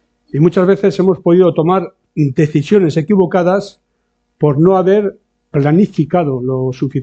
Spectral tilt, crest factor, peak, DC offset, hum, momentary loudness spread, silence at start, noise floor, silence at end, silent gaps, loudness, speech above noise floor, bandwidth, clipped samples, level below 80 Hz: -9 dB/octave; 12 dB; 0 dBFS; under 0.1%; none; 8 LU; 0.35 s; -66 dBFS; 0 s; none; -13 LUFS; 54 dB; 8 kHz; under 0.1%; -50 dBFS